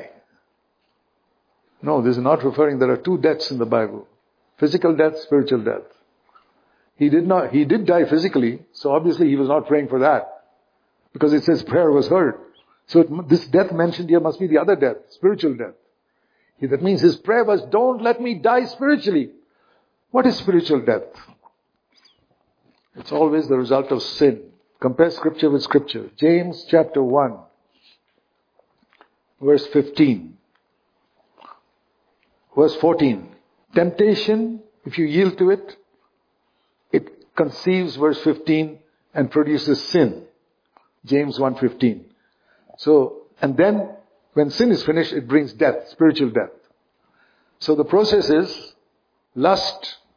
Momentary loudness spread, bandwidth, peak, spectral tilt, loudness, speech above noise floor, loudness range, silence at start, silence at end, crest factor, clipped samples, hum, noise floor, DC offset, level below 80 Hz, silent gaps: 9 LU; 5.2 kHz; -2 dBFS; -7 dB/octave; -19 LUFS; 50 dB; 4 LU; 0 s; 0.2 s; 18 dB; under 0.1%; none; -68 dBFS; under 0.1%; -62 dBFS; none